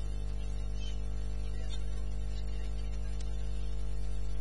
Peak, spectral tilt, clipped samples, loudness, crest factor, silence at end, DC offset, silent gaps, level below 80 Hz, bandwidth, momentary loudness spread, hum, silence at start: -24 dBFS; -6 dB/octave; under 0.1%; -40 LUFS; 8 dB; 0 s; 2%; none; -36 dBFS; 11 kHz; 0 LU; 50 Hz at -35 dBFS; 0 s